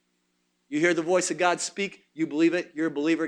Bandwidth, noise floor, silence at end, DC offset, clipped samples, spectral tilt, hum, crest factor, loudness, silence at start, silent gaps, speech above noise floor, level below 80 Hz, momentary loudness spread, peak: 11 kHz; -73 dBFS; 0 s; under 0.1%; under 0.1%; -3.5 dB/octave; 60 Hz at -60 dBFS; 18 dB; -26 LUFS; 0.7 s; none; 48 dB; -78 dBFS; 9 LU; -8 dBFS